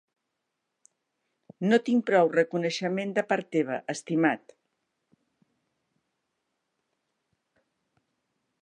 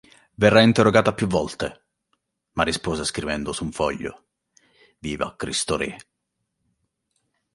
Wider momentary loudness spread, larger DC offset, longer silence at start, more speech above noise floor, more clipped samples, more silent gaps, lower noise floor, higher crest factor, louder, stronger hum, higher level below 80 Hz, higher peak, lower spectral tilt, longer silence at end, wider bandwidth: second, 8 LU vs 17 LU; neither; first, 1.6 s vs 0.4 s; about the same, 57 dB vs 57 dB; neither; neither; first, -82 dBFS vs -78 dBFS; about the same, 22 dB vs 22 dB; second, -26 LUFS vs -22 LUFS; neither; second, -84 dBFS vs -48 dBFS; second, -10 dBFS vs -2 dBFS; about the same, -5.5 dB/octave vs -4.5 dB/octave; first, 4.25 s vs 1.55 s; second, 9.8 kHz vs 11.5 kHz